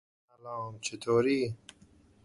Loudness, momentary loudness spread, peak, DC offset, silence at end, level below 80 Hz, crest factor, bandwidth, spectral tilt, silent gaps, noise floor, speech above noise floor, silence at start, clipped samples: -31 LUFS; 18 LU; -14 dBFS; under 0.1%; 0.7 s; -68 dBFS; 18 dB; 11.5 kHz; -5 dB/octave; none; -61 dBFS; 30 dB; 0.45 s; under 0.1%